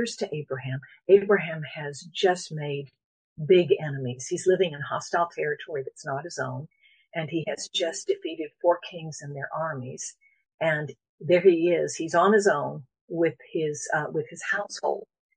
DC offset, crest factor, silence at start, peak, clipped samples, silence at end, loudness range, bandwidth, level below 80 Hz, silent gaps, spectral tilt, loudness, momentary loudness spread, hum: under 0.1%; 20 dB; 0 s; -6 dBFS; under 0.1%; 0.3 s; 6 LU; 10 kHz; -74 dBFS; 3.04-3.36 s, 10.54-10.58 s, 11.09-11.18 s, 13.01-13.08 s; -5 dB/octave; -26 LUFS; 16 LU; none